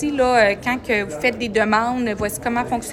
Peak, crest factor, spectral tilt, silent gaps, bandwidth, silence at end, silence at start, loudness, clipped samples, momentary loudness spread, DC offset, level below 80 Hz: -4 dBFS; 16 dB; -4.5 dB/octave; none; 16.5 kHz; 0 s; 0 s; -19 LUFS; under 0.1%; 7 LU; under 0.1%; -44 dBFS